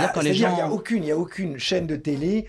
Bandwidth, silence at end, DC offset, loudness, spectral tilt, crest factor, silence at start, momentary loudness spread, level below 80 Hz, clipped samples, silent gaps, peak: 13 kHz; 0 s; under 0.1%; -24 LUFS; -5.5 dB/octave; 14 dB; 0 s; 6 LU; -52 dBFS; under 0.1%; none; -8 dBFS